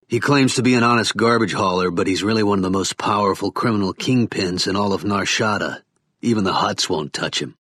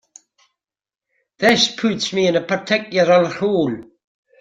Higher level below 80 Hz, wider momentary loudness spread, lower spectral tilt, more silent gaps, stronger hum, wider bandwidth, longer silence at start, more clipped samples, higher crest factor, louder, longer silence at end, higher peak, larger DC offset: about the same, -58 dBFS vs -60 dBFS; about the same, 7 LU vs 6 LU; about the same, -4.5 dB/octave vs -4 dB/octave; neither; neither; second, 13.5 kHz vs 16 kHz; second, 0.1 s vs 1.4 s; neither; about the same, 16 dB vs 20 dB; about the same, -19 LUFS vs -17 LUFS; second, 0.15 s vs 0.6 s; second, -4 dBFS vs 0 dBFS; neither